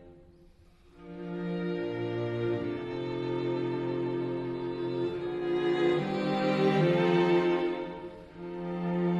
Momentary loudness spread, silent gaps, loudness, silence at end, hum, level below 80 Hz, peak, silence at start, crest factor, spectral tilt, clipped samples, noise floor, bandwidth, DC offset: 14 LU; none; -30 LUFS; 0 s; none; -62 dBFS; -14 dBFS; 0 s; 16 dB; -8 dB/octave; under 0.1%; -58 dBFS; 7.6 kHz; under 0.1%